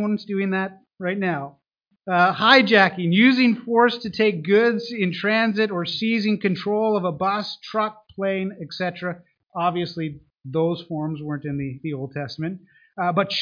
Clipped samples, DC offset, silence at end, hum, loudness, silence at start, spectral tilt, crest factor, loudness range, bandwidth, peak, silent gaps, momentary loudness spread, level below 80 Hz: under 0.1%; under 0.1%; 0 s; none; -22 LUFS; 0 s; -7 dB/octave; 22 dB; 10 LU; 5.2 kHz; 0 dBFS; none; 14 LU; -64 dBFS